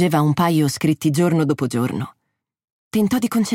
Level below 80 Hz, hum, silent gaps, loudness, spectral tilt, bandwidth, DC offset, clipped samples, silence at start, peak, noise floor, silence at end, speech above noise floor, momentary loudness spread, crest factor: -58 dBFS; none; 2.72-2.91 s; -19 LUFS; -6 dB/octave; 16.5 kHz; under 0.1%; under 0.1%; 0 s; -4 dBFS; -76 dBFS; 0 s; 58 dB; 8 LU; 14 dB